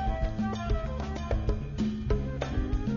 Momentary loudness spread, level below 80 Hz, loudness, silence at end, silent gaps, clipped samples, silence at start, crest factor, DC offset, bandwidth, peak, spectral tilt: 2 LU; -32 dBFS; -32 LUFS; 0 s; none; under 0.1%; 0 s; 16 dB; 0.1%; 7.4 kHz; -14 dBFS; -7.5 dB/octave